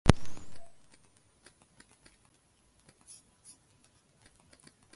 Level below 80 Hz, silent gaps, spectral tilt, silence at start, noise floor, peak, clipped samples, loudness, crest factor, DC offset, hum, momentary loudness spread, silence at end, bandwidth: -44 dBFS; none; -6 dB/octave; 0.05 s; -68 dBFS; 0 dBFS; under 0.1%; -35 LUFS; 34 dB; under 0.1%; none; 14 LU; 1.8 s; 11.5 kHz